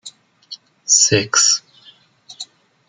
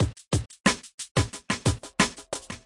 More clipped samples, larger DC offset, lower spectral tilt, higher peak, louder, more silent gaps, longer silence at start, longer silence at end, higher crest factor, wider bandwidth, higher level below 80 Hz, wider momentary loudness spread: neither; neither; second, -1 dB/octave vs -4 dB/octave; first, 0 dBFS vs -4 dBFS; first, -13 LUFS vs -27 LUFS; second, none vs 0.94-0.98 s, 1.11-1.15 s; about the same, 0.05 s vs 0 s; first, 0.45 s vs 0.05 s; about the same, 20 dB vs 24 dB; about the same, 11 kHz vs 11.5 kHz; second, -56 dBFS vs -44 dBFS; first, 25 LU vs 7 LU